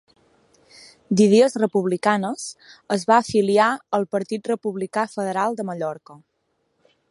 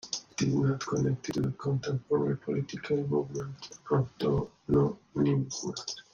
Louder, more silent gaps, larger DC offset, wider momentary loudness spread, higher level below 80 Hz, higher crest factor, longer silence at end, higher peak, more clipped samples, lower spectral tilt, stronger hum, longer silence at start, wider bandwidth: first, -21 LUFS vs -31 LUFS; neither; neither; first, 12 LU vs 8 LU; second, -66 dBFS vs -56 dBFS; about the same, 20 dB vs 16 dB; first, 0.95 s vs 0.1 s; first, -2 dBFS vs -14 dBFS; neither; about the same, -5.5 dB/octave vs -6.5 dB/octave; neither; first, 1.1 s vs 0.05 s; first, 11.5 kHz vs 7.6 kHz